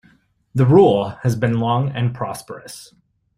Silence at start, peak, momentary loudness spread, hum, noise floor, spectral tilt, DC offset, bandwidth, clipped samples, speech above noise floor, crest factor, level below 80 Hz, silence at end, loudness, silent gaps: 0.55 s; -2 dBFS; 22 LU; none; -56 dBFS; -7.5 dB/octave; under 0.1%; 15 kHz; under 0.1%; 39 dB; 18 dB; -50 dBFS; 0.55 s; -18 LUFS; none